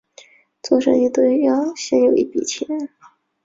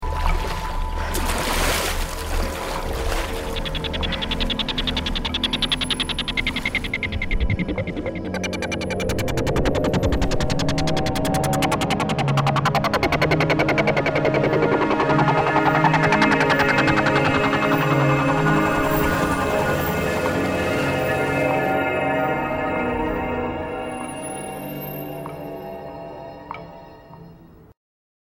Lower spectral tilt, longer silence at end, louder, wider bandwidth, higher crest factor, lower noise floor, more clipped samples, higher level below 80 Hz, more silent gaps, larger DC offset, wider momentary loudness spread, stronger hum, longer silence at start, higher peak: about the same, -4 dB/octave vs -5 dB/octave; about the same, 0.6 s vs 0.65 s; first, -18 LUFS vs -21 LUFS; second, 7.8 kHz vs over 20 kHz; about the same, 16 dB vs 18 dB; about the same, -48 dBFS vs -46 dBFS; neither; second, -62 dBFS vs -32 dBFS; neither; neither; about the same, 11 LU vs 12 LU; neither; first, 0.65 s vs 0 s; about the same, -4 dBFS vs -4 dBFS